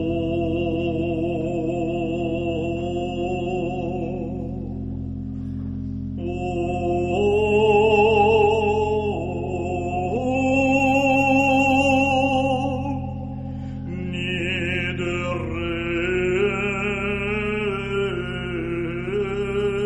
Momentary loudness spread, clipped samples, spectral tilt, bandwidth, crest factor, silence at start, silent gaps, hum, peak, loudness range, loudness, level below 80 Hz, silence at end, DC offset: 13 LU; under 0.1%; -6.5 dB/octave; 10.5 kHz; 16 dB; 0 s; none; none; -6 dBFS; 8 LU; -22 LUFS; -40 dBFS; 0 s; under 0.1%